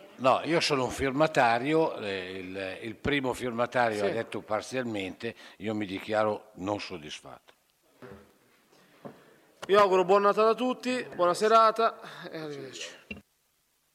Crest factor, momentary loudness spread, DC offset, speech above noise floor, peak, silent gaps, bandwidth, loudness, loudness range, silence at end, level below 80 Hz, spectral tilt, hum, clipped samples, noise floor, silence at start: 22 dB; 18 LU; under 0.1%; 44 dB; -8 dBFS; none; 15 kHz; -27 LUFS; 10 LU; 0.75 s; -60 dBFS; -4.5 dB/octave; none; under 0.1%; -72 dBFS; 0.05 s